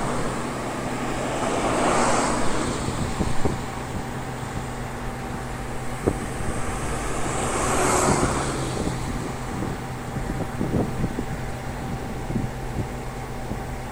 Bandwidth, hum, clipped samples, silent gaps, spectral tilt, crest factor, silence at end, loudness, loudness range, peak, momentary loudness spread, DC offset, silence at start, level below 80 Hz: 16 kHz; none; under 0.1%; none; -5 dB/octave; 20 dB; 0 s; -27 LUFS; 5 LU; -6 dBFS; 11 LU; under 0.1%; 0 s; -36 dBFS